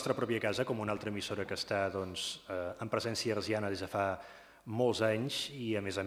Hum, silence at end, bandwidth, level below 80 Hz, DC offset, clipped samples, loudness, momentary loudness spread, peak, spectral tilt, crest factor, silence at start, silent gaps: none; 0 s; 19 kHz; -68 dBFS; under 0.1%; under 0.1%; -35 LUFS; 7 LU; -16 dBFS; -4.5 dB/octave; 20 dB; 0 s; none